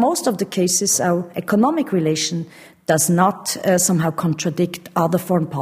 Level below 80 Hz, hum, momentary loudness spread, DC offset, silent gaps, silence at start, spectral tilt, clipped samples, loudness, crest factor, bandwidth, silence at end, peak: -60 dBFS; none; 7 LU; under 0.1%; none; 0 s; -4.5 dB/octave; under 0.1%; -19 LUFS; 18 dB; 16 kHz; 0 s; 0 dBFS